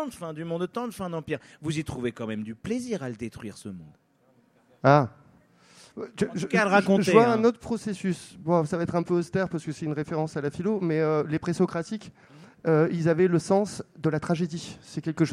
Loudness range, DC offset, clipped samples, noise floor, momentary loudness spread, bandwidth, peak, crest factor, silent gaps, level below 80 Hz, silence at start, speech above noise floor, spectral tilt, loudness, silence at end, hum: 9 LU; under 0.1%; under 0.1%; -63 dBFS; 15 LU; 13.5 kHz; -4 dBFS; 24 dB; none; -60 dBFS; 0 s; 37 dB; -6.5 dB/octave; -26 LUFS; 0 s; none